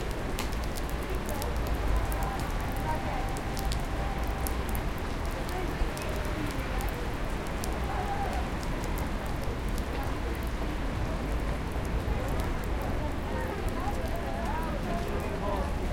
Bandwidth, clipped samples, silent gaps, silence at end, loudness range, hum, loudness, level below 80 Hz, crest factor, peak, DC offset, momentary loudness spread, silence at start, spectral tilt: 17 kHz; under 0.1%; none; 0 s; 1 LU; none; -33 LUFS; -34 dBFS; 20 dB; -12 dBFS; under 0.1%; 2 LU; 0 s; -5.5 dB/octave